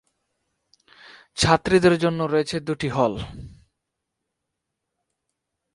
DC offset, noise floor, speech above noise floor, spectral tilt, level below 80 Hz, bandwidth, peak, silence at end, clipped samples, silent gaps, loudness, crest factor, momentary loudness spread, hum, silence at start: under 0.1%; -81 dBFS; 60 dB; -5 dB/octave; -48 dBFS; 11.5 kHz; -2 dBFS; 2.25 s; under 0.1%; none; -21 LUFS; 24 dB; 19 LU; none; 1.35 s